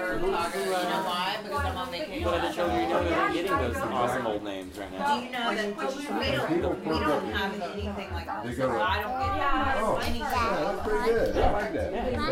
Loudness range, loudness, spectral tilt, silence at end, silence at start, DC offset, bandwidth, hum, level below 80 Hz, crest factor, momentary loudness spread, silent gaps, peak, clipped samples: 2 LU; -28 LUFS; -5 dB/octave; 0 s; 0 s; under 0.1%; 16 kHz; none; -40 dBFS; 16 dB; 7 LU; none; -12 dBFS; under 0.1%